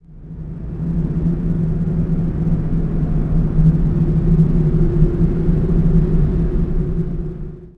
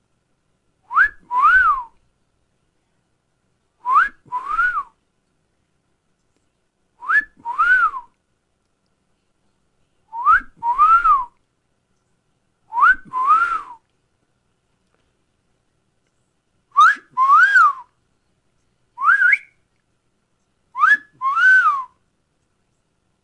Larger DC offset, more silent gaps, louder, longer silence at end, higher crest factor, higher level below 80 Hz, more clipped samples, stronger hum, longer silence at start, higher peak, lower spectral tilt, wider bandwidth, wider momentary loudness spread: neither; neither; about the same, -18 LUFS vs -16 LUFS; second, 0.05 s vs 1.4 s; about the same, 14 dB vs 16 dB; first, -20 dBFS vs -52 dBFS; neither; neither; second, 0.1 s vs 0.9 s; about the same, -2 dBFS vs -4 dBFS; first, -11.5 dB/octave vs -0.5 dB/octave; second, 2.8 kHz vs 11 kHz; second, 11 LU vs 17 LU